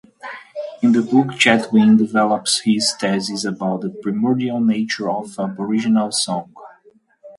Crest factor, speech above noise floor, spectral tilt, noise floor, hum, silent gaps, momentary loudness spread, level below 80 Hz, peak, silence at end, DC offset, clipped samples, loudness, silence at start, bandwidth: 18 dB; 36 dB; -4 dB/octave; -53 dBFS; none; none; 12 LU; -64 dBFS; 0 dBFS; 0.05 s; under 0.1%; under 0.1%; -18 LUFS; 0.25 s; 11.5 kHz